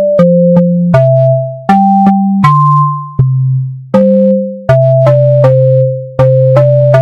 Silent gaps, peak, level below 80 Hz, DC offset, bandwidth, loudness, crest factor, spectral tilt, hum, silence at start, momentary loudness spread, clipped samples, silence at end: none; 0 dBFS; -40 dBFS; under 0.1%; 5.6 kHz; -8 LUFS; 8 dB; -10.5 dB/octave; none; 0 s; 6 LU; 0.5%; 0 s